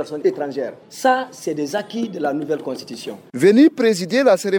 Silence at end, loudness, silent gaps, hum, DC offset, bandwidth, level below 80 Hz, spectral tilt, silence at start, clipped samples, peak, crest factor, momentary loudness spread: 0 s; -19 LUFS; none; none; under 0.1%; 19 kHz; -72 dBFS; -5 dB/octave; 0 s; under 0.1%; -4 dBFS; 16 dB; 16 LU